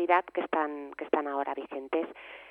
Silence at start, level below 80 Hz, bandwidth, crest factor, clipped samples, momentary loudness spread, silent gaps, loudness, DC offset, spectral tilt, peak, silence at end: 0 s; -76 dBFS; 5.2 kHz; 22 dB; under 0.1%; 12 LU; none; -32 LUFS; under 0.1%; -6 dB/octave; -8 dBFS; 0 s